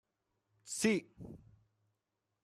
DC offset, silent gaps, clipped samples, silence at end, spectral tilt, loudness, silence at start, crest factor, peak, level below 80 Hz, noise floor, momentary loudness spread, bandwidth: under 0.1%; none; under 0.1%; 1.05 s; -4 dB/octave; -35 LUFS; 0.65 s; 24 dB; -18 dBFS; -74 dBFS; -87 dBFS; 21 LU; 13.5 kHz